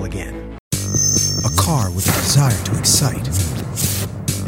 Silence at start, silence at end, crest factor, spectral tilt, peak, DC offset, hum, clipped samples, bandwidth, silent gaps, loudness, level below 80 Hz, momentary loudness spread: 0 s; 0 s; 18 dB; -3.5 dB/octave; 0 dBFS; under 0.1%; none; under 0.1%; 17.5 kHz; 0.60-0.71 s; -17 LUFS; -34 dBFS; 11 LU